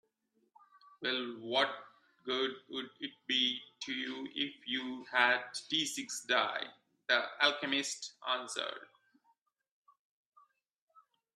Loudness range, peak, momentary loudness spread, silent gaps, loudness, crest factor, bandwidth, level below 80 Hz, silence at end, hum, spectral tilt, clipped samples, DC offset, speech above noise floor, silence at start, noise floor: 7 LU; -12 dBFS; 13 LU; none; -34 LUFS; 26 dB; 12.5 kHz; -88 dBFS; 2.5 s; none; -1 dB/octave; under 0.1%; under 0.1%; 42 dB; 1 s; -78 dBFS